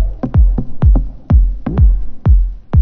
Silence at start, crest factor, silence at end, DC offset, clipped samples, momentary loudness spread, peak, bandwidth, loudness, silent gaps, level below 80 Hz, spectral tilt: 0 s; 10 dB; 0 s; under 0.1%; under 0.1%; 3 LU; 0 dBFS; 2.4 kHz; -15 LUFS; none; -12 dBFS; -12 dB/octave